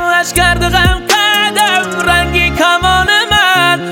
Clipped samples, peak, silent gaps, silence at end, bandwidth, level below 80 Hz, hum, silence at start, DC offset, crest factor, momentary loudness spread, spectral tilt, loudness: under 0.1%; 0 dBFS; none; 0 s; 17.5 kHz; -24 dBFS; none; 0 s; under 0.1%; 10 dB; 3 LU; -3 dB/octave; -9 LUFS